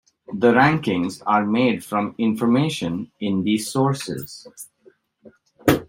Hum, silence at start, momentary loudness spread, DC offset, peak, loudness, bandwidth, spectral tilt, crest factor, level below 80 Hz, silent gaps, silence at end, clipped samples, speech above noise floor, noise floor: none; 0.3 s; 18 LU; under 0.1%; -2 dBFS; -21 LUFS; 16.5 kHz; -6 dB/octave; 20 dB; -56 dBFS; none; 0.05 s; under 0.1%; 35 dB; -56 dBFS